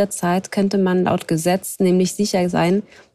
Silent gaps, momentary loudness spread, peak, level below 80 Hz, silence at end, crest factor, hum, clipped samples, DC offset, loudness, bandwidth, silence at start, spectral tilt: none; 3 LU; -6 dBFS; -56 dBFS; 0.35 s; 12 dB; none; under 0.1%; under 0.1%; -19 LUFS; 15 kHz; 0 s; -5.5 dB/octave